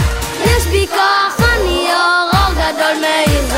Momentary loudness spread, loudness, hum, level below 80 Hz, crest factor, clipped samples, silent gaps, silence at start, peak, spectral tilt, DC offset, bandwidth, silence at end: 3 LU; -13 LUFS; none; -22 dBFS; 12 dB; under 0.1%; none; 0 s; 0 dBFS; -4 dB/octave; under 0.1%; 16.5 kHz; 0 s